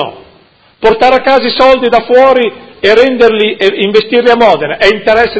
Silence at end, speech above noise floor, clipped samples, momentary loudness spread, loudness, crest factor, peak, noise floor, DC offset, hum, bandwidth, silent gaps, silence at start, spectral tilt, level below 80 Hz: 0 s; 37 dB; 3%; 5 LU; -8 LUFS; 8 dB; 0 dBFS; -44 dBFS; under 0.1%; none; 8 kHz; none; 0 s; -5 dB/octave; -40 dBFS